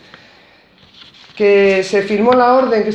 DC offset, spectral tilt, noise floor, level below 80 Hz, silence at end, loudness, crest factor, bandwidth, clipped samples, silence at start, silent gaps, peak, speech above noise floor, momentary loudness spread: under 0.1%; -5.5 dB/octave; -47 dBFS; -52 dBFS; 0 s; -12 LUFS; 14 dB; 8.8 kHz; under 0.1%; 1.35 s; none; 0 dBFS; 36 dB; 5 LU